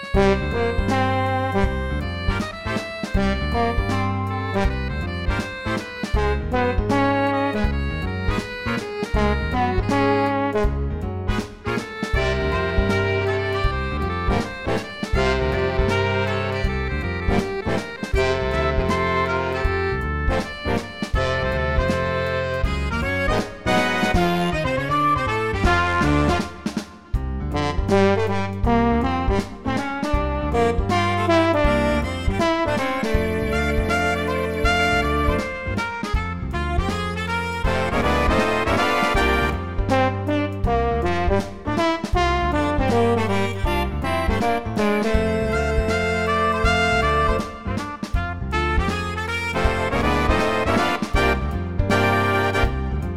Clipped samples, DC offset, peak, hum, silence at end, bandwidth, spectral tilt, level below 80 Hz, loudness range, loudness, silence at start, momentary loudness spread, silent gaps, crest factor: under 0.1%; 0.7%; -4 dBFS; none; 0 s; 15 kHz; -6 dB/octave; -28 dBFS; 3 LU; -22 LUFS; 0 s; 7 LU; none; 16 dB